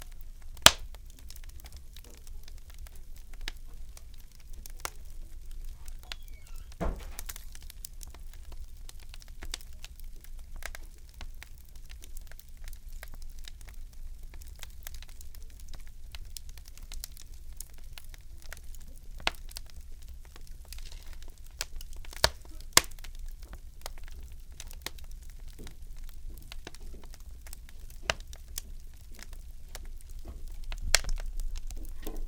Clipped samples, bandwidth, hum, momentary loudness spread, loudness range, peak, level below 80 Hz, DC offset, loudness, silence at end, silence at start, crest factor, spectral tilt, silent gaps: under 0.1%; 18 kHz; none; 17 LU; 17 LU; 0 dBFS; -42 dBFS; under 0.1%; -32 LUFS; 0 s; 0 s; 36 dB; -1 dB/octave; none